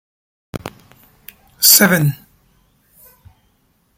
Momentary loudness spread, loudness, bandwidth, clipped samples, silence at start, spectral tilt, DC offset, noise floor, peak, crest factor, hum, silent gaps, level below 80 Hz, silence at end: 26 LU; -11 LUFS; 17 kHz; under 0.1%; 0.55 s; -2.5 dB/octave; under 0.1%; -60 dBFS; 0 dBFS; 20 dB; none; none; -54 dBFS; 1.85 s